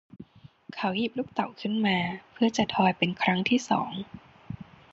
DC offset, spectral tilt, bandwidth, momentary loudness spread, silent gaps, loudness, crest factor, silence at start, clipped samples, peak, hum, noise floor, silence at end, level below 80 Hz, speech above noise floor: under 0.1%; -5 dB/octave; 8 kHz; 18 LU; none; -27 LUFS; 20 dB; 0.15 s; under 0.1%; -8 dBFS; none; -49 dBFS; 0.3 s; -62 dBFS; 22 dB